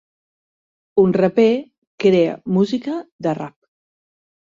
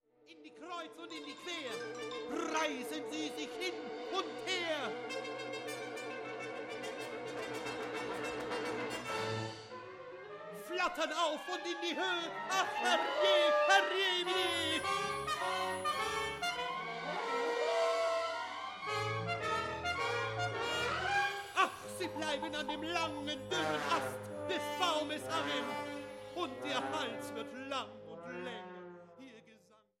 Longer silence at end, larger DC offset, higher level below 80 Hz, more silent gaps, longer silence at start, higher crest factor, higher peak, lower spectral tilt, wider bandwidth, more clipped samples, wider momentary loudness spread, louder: first, 1.05 s vs 0.45 s; neither; first, -60 dBFS vs -70 dBFS; first, 1.78-1.98 s, 3.12-3.19 s vs none; first, 0.95 s vs 0.3 s; about the same, 18 dB vs 22 dB; first, -2 dBFS vs -14 dBFS; first, -8 dB/octave vs -3 dB/octave; second, 7.6 kHz vs 16.5 kHz; neither; second, 10 LU vs 13 LU; first, -18 LUFS vs -36 LUFS